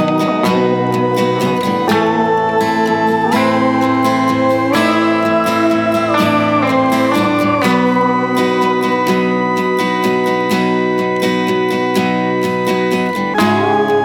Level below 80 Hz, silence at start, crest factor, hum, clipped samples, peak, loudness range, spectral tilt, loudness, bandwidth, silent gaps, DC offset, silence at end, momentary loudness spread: -52 dBFS; 0 s; 12 dB; none; under 0.1%; 0 dBFS; 2 LU; -6 dB/octave; -14 LUFS; 19 kHz; none; under 0.1%; 0 s; 2 LU